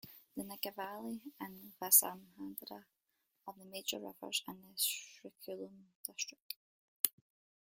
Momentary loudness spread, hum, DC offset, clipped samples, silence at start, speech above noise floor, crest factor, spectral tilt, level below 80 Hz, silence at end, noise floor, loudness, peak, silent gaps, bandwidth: 23 LU; none; under 0.1%; under 0.1%; 0.05 s; 43 dB; 36 dB; -0.5 dB/octave; -86 dBFS; 0.6 s; -83 dBFS; -36 LUFS; -6 dBFS; 5.95-6.04 s, 6.42-6.50 s, 6.56-7.04 s; 16.5 kHz